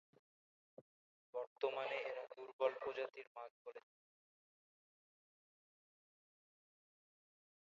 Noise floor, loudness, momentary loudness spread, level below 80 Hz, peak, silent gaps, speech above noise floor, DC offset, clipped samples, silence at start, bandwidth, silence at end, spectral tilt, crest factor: under -90 dBFS; -45 LUFS; 15 LU; under -90 dBFS; -24 dBFS; 0.81-1.33 s, 1.47-1.56 s, 2.53-2.59 s, 3.27-3.35 s, 3.50-3.65 s; over 45 dB; under 0.1%; under 0.1%; 0.8 s; 7.2 kHz; 3.95 s; 0 dB/octave; 26 dB